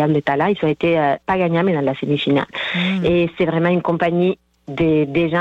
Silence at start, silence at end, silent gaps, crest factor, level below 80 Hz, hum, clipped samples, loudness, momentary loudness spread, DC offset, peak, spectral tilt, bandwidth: 0 s; 0 s; none; 10 dB; -48 dBFS; none; under 0.1%; -18 LUFS; 3 LU; under 0.1%; -8 dBFS; -8 dB/octave; 7.6 kHz